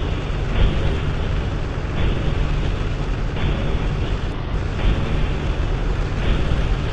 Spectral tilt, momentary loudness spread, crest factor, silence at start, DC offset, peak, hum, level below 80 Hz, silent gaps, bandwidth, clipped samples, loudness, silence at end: -7 dB/octave; 4 LU; 14 dB; 0 s; under 0.1%; -6 dBFS; none; -22 dBFS; none; 8.4 kHz; under 0.1%; -23 LUFS; 0 s